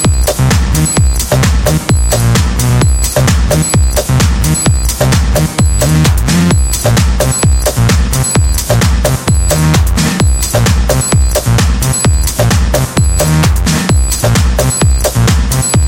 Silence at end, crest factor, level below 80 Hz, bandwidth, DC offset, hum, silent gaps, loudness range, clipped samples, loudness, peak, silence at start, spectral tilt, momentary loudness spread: 0 s; 10 dB; -14 dBFS; 17.5 kHz; 0.3%; none; none; 0 LU; under 0.1%; -10 LUFS; 0 dBFS; 0 s; -4.5 dB/octave; 2 LU